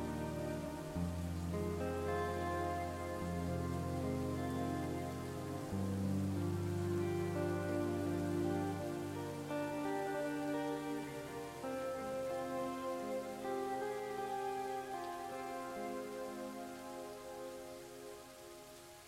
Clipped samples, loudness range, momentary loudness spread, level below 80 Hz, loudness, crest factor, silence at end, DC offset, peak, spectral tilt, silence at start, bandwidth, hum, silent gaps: under 0.1%; 6 LU; 10 LU; -60 dBFS; -41 LUFS; 16 dB; 0 s; under 0.1%; -26 dBFS; -6.5 dB/octave; 0 s; 16 kHz; none; none